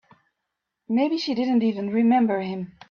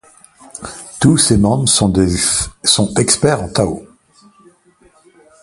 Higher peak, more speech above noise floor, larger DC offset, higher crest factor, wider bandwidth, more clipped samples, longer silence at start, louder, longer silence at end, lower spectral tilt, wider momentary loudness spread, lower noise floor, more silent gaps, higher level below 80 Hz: second, -12 dBFS vs 0 dBFS; first, 59 dB vs 38 dB; neither; about the same, 12 dB vs 16 dB; second, 6.8 kHz vs 11.5 kHz; neither; first, 0.9 s vs 0.55 s; second, -23 LUFS vs -13 LUFS; second, 0.2 s vs 1.6 s; first, -7 dB/octave vs -4 dB/octave; second, 9 LU vs 18 LU; first, -82 dBFS vs -51 dBFS; neither; second, -70 dBFS vs -34 dBFS